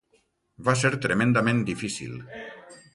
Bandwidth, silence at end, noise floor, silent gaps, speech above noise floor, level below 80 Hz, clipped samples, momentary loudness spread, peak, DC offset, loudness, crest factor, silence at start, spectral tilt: 11.5 kHz; 0.2 s; -67 dBFS; none; 43 dB; -58 dBFS; under 0.1%; 19 LU; -8 dBFS; under 0.1%; -25 LUFS; 20 dB; 0.6 s; -5.5 dB/octave